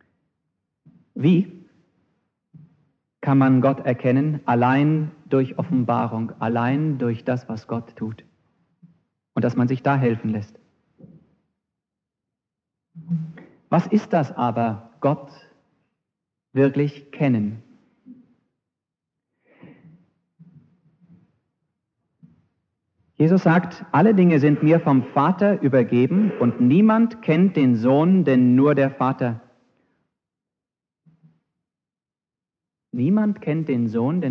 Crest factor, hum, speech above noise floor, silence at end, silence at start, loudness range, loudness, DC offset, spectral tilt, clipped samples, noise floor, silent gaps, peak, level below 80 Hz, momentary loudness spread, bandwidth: 18 dB; none; over 71 dB; 0 s; 1.15 s; 11 LU; -20 LUFS; under 0.1%; -9.5 dB/octave; under 0.1%; under -90 dBFS; none; -4 dBFS; -72 dBFS; 13 LU; 6.6 kHz